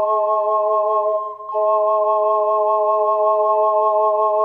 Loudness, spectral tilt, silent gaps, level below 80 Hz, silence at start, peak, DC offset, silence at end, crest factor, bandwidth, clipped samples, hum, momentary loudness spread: -17 LUFS; -6 dB/octave; none; -74 dBFS; 0 s; -6 dBFS; under 0.1%; 0 s; 10 dB; 3.4 kHz; under 0.1%; none; 3 LU